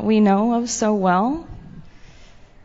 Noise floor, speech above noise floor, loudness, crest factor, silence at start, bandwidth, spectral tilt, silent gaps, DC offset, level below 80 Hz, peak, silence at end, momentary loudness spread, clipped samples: -44 dBFS; 27 dB; -19 LUFS; 16 dB; 0 s; 8 kHz; -6 dB/octave; none; under 0.1%; -46 dBFS; -4 dBFS; 0.4 s; 19 LU; under 0.1%